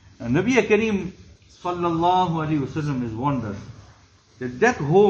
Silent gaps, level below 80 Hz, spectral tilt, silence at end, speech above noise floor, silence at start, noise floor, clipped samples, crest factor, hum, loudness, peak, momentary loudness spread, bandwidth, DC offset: none; -50 dBFS; -6.5 dB/octave; 0 s; 32 dB; 0.2 s; -53 dBFS; under 0.1%; 18 dB; none; -22 LUFS; -4 dBFS; 15 LU; 7.8 kHz; under 0.1%